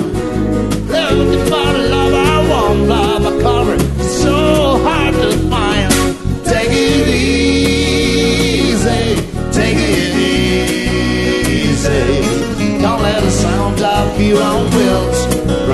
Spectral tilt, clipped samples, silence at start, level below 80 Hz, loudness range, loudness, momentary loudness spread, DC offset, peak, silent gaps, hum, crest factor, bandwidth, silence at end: -5 dB/octave; under 0.1%; 0 s; -22 dBFS; 1 LU; -13 LUFS; 4 LU; under 0.1%; 0 dBFS; none; none; 12 dB; 12.5 kHz; 0 s